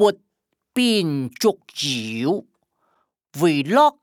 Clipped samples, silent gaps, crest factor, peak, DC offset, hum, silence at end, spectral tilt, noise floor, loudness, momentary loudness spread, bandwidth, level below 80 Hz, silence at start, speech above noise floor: under 0.1%; none; 18 dB; -4 dBFS; under 0.1%; none; 0.1 s; -4.5 dB/octave; -68 dBFS; -21 LUFS; 11 LU; 18 kHz; -72 dBFS; 0 s; 49 dB